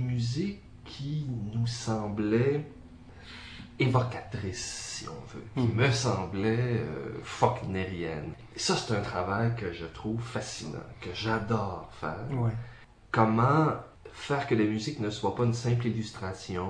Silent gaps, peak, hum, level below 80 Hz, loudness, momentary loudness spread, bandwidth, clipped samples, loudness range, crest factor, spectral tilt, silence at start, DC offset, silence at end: none; -8 dBFS; none; -54 dBFS; -30 LUFS; 14 LU; 10.5 kHz; under 0.1%; 4 LU; 22 dB; -6 dB/octave; 0 s; under 0.1%; 0 s